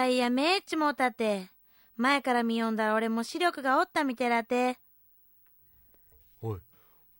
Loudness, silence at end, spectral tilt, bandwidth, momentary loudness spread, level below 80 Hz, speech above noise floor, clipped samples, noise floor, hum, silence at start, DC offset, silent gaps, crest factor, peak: -28 LUFS; 0.6 s; -4.5 dB/octave; 16.5 kHz; 13 LU; -72 dBFS; 34 dB; under 0.1%; -62 dBFS; none; 0 s; under 0.1%; none; 18 dB; -12 dBFS